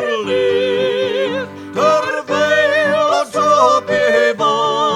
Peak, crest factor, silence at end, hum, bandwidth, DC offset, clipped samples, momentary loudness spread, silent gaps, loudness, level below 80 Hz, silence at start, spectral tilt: 0 dBFS; 14 dB; 0 s; none; 14 kHz; under 0.1%; under 0.1%; 6 LU; none; -15 LUFS; -62 dBFS; 0 s; -3.5 dB/octave